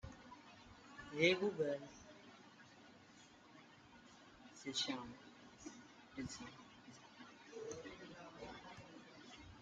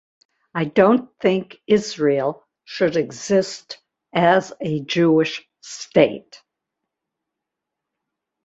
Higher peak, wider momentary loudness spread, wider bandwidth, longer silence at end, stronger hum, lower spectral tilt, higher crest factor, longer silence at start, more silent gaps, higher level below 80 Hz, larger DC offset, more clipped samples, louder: second, -20 dBFS vs 0 dBFS; first, 23 LU vs 18 LU; first, 9 kHz vs 8 kHz; second, 0 s vs 2.1 s; neither; second, -4 dB/octave vs -5.5 dB/octave; first, 28 dB vs 20 dB; second, 0.05 s vs 0.55 s; neither; second, -74 dBFS vs -62 dBFS; neither; neither; second, -44 LUFS vs -20 LUFS